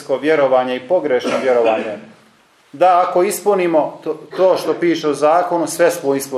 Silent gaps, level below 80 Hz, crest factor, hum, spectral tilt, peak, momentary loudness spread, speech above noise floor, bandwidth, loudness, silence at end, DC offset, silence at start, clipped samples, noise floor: none; -72 dBFS; 14 dB; none; -4.5 dB/octave; -2 dBFS; 7 LU; 36 dB; 15 kHz; -16 LUFS; 0 s; under 0.1%; 0 s; under 0.1%; -52 dBFS